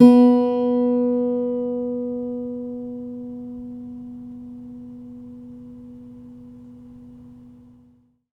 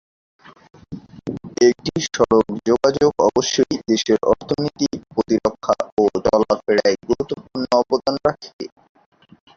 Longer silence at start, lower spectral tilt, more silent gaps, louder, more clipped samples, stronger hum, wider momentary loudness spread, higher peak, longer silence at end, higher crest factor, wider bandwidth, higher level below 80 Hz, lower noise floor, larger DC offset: second, 0 s vs 0.9 s; first, -8.5 dB/octave vs -4.5 dB/octave; second, none vs 5.92-5.97 s, 8.53-8.59 s; about the same, -21 LUFS vs -19 LUFS; neither; neither; first, 23 LU vs 15 LU; about the same, -2 dBFS vs -2 dBFS; about the same, 1 s vs 0.9 s; about the same, 20 dB vs 18 dB; second, 5.2 kHz vs 7.6 kHz; second, -58 dBFS vs -50 dBFS; first, -57 dBFS vs -37 dBFS; neither